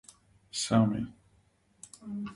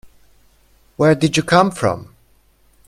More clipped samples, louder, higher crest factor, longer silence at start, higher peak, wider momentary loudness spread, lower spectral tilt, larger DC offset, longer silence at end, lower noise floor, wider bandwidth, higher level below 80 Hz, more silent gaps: neither; second, -31 LUFS vs -16 LUFS; about the same, 20 dB vs 20 dB; second, 0.55 s vs 1 s; second, -12 dBFS vs 0 dBFS; first, 24 LU vs 7 LU; about the same, -5.5 dB/octave vs -5.5 dB/octave; neither; second, 0 s vs 0.85 s; first, -67 dBFS vs -55 dBFS; second, 11.5 kHz vs 14 kHz; second, -62 dBFS vs -50 dBFS; neither